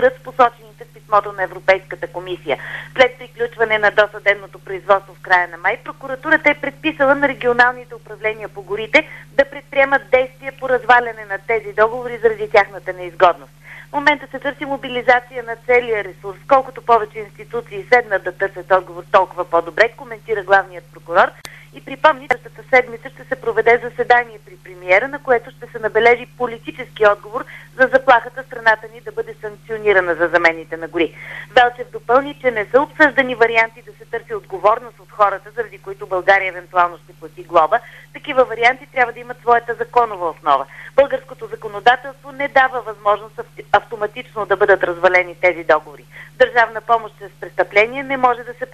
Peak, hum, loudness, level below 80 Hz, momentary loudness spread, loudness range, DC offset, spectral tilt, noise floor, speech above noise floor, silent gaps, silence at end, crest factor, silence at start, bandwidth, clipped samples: 0 dBFS; none; -17 LUFS; -50 dBFS; 14 LU; 2 LU; 0.2%; -4.5 dB/octave; -41 dBFS; 24 dB; none; 0.1 s; 16 dB; 0 s; 13.5 kHz; under 0.1%